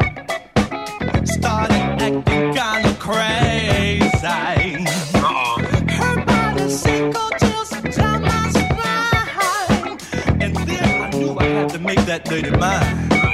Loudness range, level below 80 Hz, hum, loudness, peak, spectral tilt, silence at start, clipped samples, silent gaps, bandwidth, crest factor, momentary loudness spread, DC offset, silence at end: 1 LU; -32 dBFS; none; -18 LUFS; -4 dBFS; -5 dB/octave; 0 s; under 0.1%; none; 16 kHz; 14 dB; 4 LU; 0.1%; 0 s